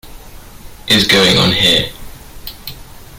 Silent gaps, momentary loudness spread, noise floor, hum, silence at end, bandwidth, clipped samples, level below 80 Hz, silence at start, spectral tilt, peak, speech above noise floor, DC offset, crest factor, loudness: none; 23 LU; -34 dBFS; none; 0 s; 17 kHz; under 0.1%; -36 dBFS; 0.05 s; -3.5 dB/octave; 0 dBFS; 23 dB; under 0.1%; 16 dB; -10 LUFS